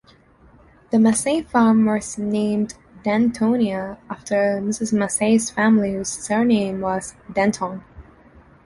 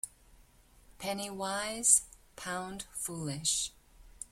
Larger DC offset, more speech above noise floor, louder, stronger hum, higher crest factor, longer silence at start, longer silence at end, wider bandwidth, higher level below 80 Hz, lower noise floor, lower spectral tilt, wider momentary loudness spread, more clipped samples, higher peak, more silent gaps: neither; first, 32 dB vs 28 dB; first, -20 LUFS vs -31 LUFS; neither; second, 16 dB vs 26 dB; first, 0.9 s vs 0.05 s; first, 0.65 s vs 0.05 s; second, 11.5 kHz vs 16.5 kHz; first, -52 dBFS vs -62 dBFS; second, -52 dBFS vs -61 dBFS; first, -5 dB/octave vs -1.5 dB/octave; second, 11 LU vs 20 LU; neither; first, -4 dBFS vs -10 dBFS; neither